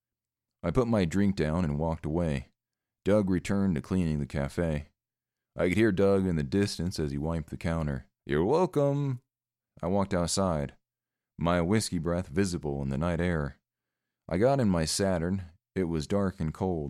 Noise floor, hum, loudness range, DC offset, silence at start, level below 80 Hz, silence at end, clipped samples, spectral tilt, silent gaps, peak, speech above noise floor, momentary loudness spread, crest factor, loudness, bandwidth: under -90 dBFS; none; 2 LU; under 0.1%; 0.65 s; -46 dBFS; 0 s; under 0.1%; -6 dB/octave; none; -12 dBFS; over 62 dB; 9 LU; 18 dB; -29 LUFS; 14 kHz